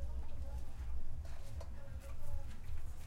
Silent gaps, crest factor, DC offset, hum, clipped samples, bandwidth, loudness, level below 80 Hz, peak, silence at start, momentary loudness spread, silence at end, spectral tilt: none; 10 dB; under 0.1%; none; under 0.1%; 7.4 kHz; -49 LUFS; -44 dBFS; -26 dBFS; 0 s; 3 LU; 0 s; -6 dB/octave